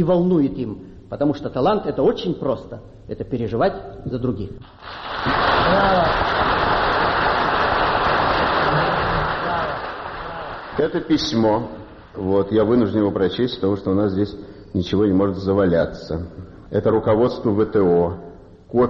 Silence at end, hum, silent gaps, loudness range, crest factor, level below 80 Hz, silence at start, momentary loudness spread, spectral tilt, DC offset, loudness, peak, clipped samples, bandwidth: 0 s; none; none; 5 LU; 14 dB; -40 dBFS; 0 s; 14 LU; -4.5 dB/octave; under 0.1%; -20 LUFS; -6 dBFS; under 0.1%; 6.8 kHz